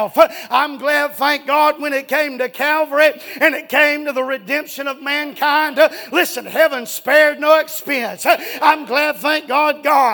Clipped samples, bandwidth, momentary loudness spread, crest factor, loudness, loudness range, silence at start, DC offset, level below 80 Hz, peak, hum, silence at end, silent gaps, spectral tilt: under 0.1%; 19.5 kHz; 7 LU; 16 dB; -16 LUFS; 2 LU; 0 s; under 0.1%; -66 dBFS; 0 dBFS; none; 0 s; none; -2 dB/octave